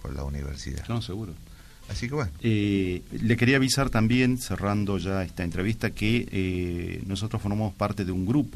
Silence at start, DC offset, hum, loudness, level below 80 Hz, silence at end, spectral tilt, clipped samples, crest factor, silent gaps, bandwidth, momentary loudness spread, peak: 0 s; under 0.1%; none; -27 LUFS; -40 dBFS; 0 s; -6 dB/octave; under 0.1%; 20 dB; none; 14 kHz; 12 LU; -8 dBFS